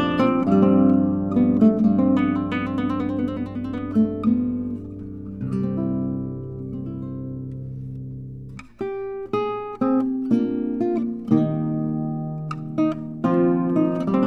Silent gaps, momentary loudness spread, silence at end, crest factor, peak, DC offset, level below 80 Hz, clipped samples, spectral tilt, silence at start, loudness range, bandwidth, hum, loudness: none; 16 LU; 0 s; 18 dB; -4 dBFS; under 0.1%; -50 dBFS; under 0.1%; -9.5 dB/octave; 0 s; 10 LU; 6 kHz; none; -22 LUFS